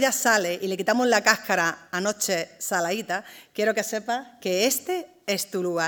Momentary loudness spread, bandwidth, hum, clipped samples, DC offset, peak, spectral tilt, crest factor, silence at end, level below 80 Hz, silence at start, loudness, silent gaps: 10 LU; 19.5 kHz; none; under 0.1%; under 0.1%; 0 dBFS; -2.5 dB/octave; 24 dB; 0 s; -80 dBFS; 0 s; -24 LUFS; none